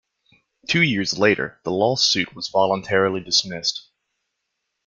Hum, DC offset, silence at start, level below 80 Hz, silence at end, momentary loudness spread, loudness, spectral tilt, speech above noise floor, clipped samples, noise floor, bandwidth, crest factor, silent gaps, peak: none; under 0.1%; 0.7 s; -60 dBFS; 1.05 s; 7 LU; -20 LUFS; -3.5 dB/octave; 57 dB; under 0.1%; -78 dBFS; 9.2 kHz; 20 dB; none; -2 dBFS